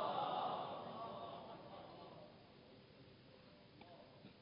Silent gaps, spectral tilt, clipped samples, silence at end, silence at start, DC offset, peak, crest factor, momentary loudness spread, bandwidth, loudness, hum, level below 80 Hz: none; -3 dB/octave; under 0.1%; 0 s; 0 s; under 0.1%; -28 dBFS; 20 dB; 21 LU; 5.2 kHz; -48 LUFS; none; -80 dBFS